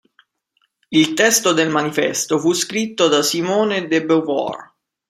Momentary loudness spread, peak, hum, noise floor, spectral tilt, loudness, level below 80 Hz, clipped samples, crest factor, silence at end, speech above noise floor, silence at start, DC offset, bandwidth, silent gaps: 7 LU; 0 dBFS; none; -67 dBFS; -3 dB/octave; -17 LUFS; -64 dBFS; under 0.1%; 18 dB; 0.45 s; 50 dB; 0.9 s; under 0.1%; 15.5 kHz; none